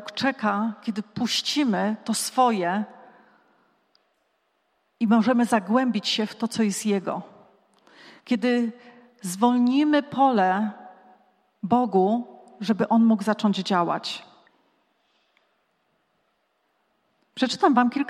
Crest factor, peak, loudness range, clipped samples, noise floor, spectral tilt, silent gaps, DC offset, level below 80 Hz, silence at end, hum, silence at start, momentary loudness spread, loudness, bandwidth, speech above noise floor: 20 dB; -6 dBFS; 5 LU; under 0.1%; -71 dBFS; -4.5 dB/octave; none; under 0.1%; -76 dBFS; 0 s; none; 0 s; 12 LU; -23 LUFS; 14 kHz; 49 dB